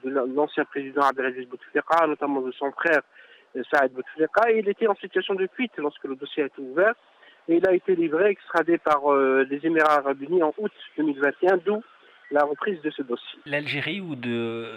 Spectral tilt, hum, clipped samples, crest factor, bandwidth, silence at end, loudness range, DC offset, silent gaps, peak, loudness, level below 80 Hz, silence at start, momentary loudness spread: -6.5 dB/octave; none; under 0.1%; 16 dB; 10.5 kHz; 0 s; 4 LU; under 0.1%; none; -10 dBFS; -24 LUFS; -72 dBFS; 0.05 s; 10 LU